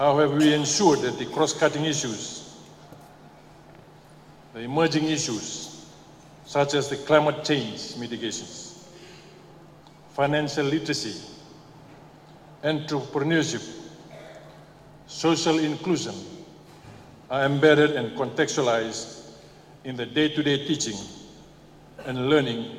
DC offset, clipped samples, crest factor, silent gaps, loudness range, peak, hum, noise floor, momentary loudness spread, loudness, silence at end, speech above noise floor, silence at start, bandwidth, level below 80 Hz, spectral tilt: under 0.1%; under 0.1%; 24 dB; none; 6 LU; -2 dBFS; none; -50 dBFS; 24 LU; -24 LUFS; 0 s; 26 dB; 0 s; 14.5 kHz; -62 dBFS; -4 dB/octave